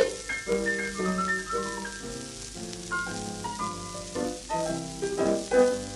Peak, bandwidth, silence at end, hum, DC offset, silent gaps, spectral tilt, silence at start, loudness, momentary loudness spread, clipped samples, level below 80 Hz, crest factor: -8 dBFS; 13 kHz; 0 s; none; under 0.1%; none; -4 dB/octave; 0 s; -30 LUFS; 12 LU; under 0.1%; -50 dBFS; 22 dB